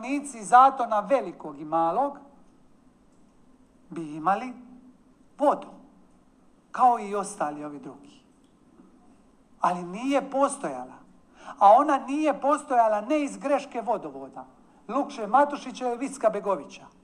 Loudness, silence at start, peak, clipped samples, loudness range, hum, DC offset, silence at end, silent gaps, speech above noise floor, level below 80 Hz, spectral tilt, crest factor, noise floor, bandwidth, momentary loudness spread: -25 LUFS; 0 s; -4 dBFS; under 0.1%; 8 LU; none; under 0.1%; 0.15 s; none; 34 dB; -68 dBFS; -5 dB/octave; 22 dB; -59 dBFS; 10.5 kHz; 19 LU